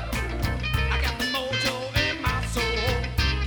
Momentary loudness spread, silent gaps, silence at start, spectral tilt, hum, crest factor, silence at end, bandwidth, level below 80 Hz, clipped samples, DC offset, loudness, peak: 3 LU; none; 0 s; -4.5 dB/octave; none; 16 dB; 0 s; over 20 kHz; -30 dBFS; under 0.1%; under 0.1%; -25 LUFS; -10 dBFS